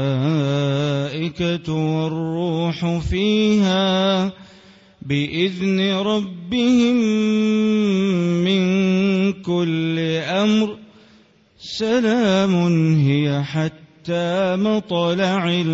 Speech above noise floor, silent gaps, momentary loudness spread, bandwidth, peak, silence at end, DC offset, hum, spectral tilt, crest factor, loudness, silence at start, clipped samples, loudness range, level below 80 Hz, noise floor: 34 dB; none; 7 LU; 7.8 kHz; -4 dBFS; 0 s; under 0.1%; none; -6.5 dB/octave; 14 dB; -19 LUFS; 0 s; under 0.1%; 3 LU; -44 dBFS; -53 dBFS